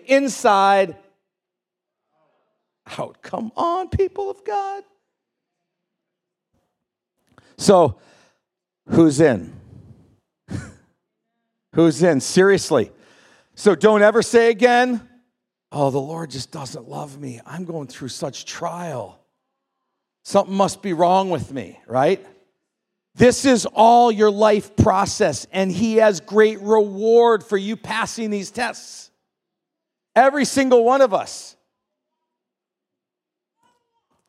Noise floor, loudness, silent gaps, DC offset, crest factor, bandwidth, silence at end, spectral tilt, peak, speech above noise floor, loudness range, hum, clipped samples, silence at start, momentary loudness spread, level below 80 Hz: -85 dBFS; -18 LUFS; none; under 0.1%; 20 dB; 13.5 kHz; 2.8 s; -5 dB/octave; 0 dBFS; 67 dB; 12 LU; none; under 0.1%; 0.1 s; 18 LU; -52 dBFS